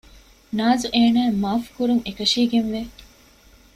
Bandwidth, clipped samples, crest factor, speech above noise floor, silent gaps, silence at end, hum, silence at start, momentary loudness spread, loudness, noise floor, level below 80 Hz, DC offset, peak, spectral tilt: 14 kHz; under 0.1%; 16 dB; 31 dB; none; 0.7 s; none; 0.5 s; 11 LU; -21 LUFS; -51 dBFS; -50 dBFS; under 0.1%; -6 dBFS; -4.5 dB/octave